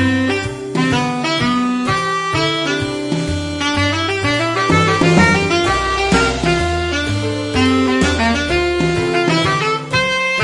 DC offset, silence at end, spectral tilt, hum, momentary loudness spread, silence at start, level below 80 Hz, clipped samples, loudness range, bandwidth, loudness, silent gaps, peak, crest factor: under 0.1%; 0 s; -5 dB/octave; none; 6 LU; 0 s; -34 dBFS; under 0.1%; 3 LU; 11.5 kHz; -16 LUFS; none; 0 dBFS; 16 dB